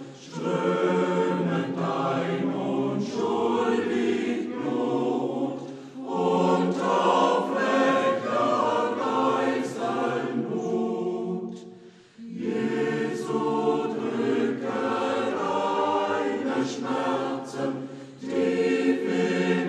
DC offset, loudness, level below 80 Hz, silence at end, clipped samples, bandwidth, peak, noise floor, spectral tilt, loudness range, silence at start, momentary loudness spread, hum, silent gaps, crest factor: under 0.1%; -26 LUFS; -78 dBFS; 0 s; under 0.1%; 10.5 kHz; -8 dBFS; -49 dBFS; -6 dB/octave; 5 LU; 0 s; 8 LU; none; none; 16 dB